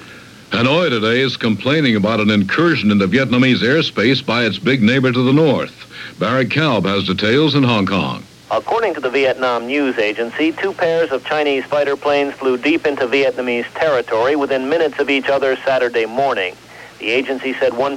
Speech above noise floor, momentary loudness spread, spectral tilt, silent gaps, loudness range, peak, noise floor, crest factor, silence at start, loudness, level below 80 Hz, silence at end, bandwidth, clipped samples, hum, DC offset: 23 dB; 5 LU; -6 dB/octave; none; 3 LU; -2 dBFS; -38 dBFS; 14 dB; 0 s; -16 LUFS; -56 dBFS; 0 s; 14 kHz; under 0.1%; none; under 0.1%